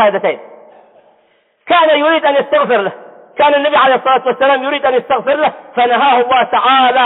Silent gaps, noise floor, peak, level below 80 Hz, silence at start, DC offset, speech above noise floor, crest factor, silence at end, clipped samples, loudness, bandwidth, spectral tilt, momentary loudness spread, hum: none; -55 dBFS; -2 dBFS; -64 dBFS; 0 s; under 0.1%; 44 dB; 10 dB; 0 s; under 0.1%; -12 LUFS; 4.1 kHz; -8 dB/octave; 6 LU; none